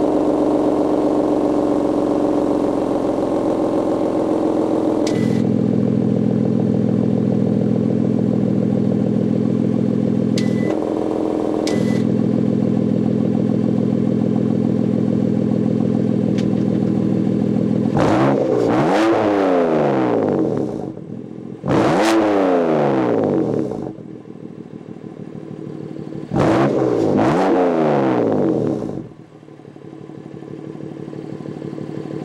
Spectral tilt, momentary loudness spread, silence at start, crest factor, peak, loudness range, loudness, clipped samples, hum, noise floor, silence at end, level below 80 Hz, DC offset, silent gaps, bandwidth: -8 dB/octave; 16 LU; 0 s; 14 dB; -2 dBFS; 5 LU; -18 LUFS; under 0.1%; none; -40 dBFS; 0 s; -50 dBFS; under 0.1%; none; 11.5 kHz